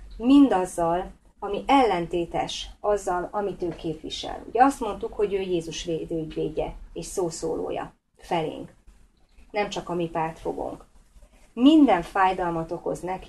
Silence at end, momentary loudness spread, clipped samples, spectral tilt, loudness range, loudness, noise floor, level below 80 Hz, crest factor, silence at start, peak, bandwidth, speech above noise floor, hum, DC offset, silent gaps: 0 s; 15 LU; under 0.1%; -5 dB/octave; 8 LU; -25 LUFS; -55 dBFS; -48 dBFS; 20 dB; 0 s; -4 dBFS; 12.5 kHz; 31 dB; none; under 0.1%; none